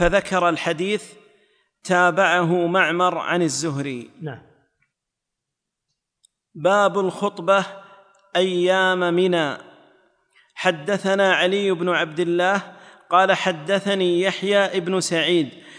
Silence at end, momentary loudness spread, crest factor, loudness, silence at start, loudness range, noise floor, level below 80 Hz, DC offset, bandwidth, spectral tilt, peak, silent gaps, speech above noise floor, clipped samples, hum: 0 s; 9 LU; 18 dB; -20 LUFS; 0 s; 6 LU; -83 dBFS; -48 dBFS; under 0.1%; 10.5 kHz; -4.5 dB/octave; -4 dBFS; none; 63 dB; under 0.1%; none